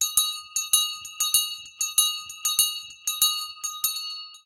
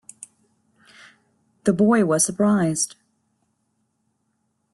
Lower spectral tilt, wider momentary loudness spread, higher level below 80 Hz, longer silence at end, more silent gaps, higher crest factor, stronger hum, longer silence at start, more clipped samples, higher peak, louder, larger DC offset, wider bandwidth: second, 4.5 dB/octave vs -5 dB/octave; about the same, 9 LU vs 9 LU; about the same, -66 dBFS vs -64 dBFS; second, 0.1 s vs 1.9 s; neither; about the same, 22 dB vs 20 dB; neither; second, 0 s vs 1.65 s; neither; about the same, -4 dBFS vs -4 dBFS; second, -23 LUFS vs -20 LUFS; neither; first, 17 kHz vs 12.5 kHz